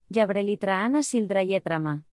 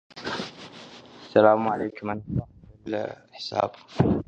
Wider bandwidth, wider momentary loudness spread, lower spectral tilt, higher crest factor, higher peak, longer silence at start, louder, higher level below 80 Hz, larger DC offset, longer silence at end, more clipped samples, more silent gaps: first, 12 kHz vs 8.6 kHz; second, 3 LU vs 23 LU; second, -5.5 dB/octave vs -7 dB/octave; second, 16 dB vs 22 dB; second, -10 dBFS vs -4 dBFS; about the same, 0.1 s vs 0.15 s; about the same, -25 LUFS vs -26 LUFS; second, -68 dBFS vs -48 dBFS; neither; about the same, 0.1 s vs 0.05 s; neither; neither